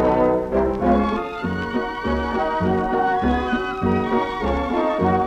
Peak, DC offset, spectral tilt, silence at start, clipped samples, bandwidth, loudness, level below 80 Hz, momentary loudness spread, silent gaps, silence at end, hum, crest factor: -6 dBFS; under 0.1%; -7.5 dB/octave; 0 s; under 0.1%; 8.8 kHz; -21 LUFS; -34 dBFS; 5 LU; none; 0 s; none; 14 dB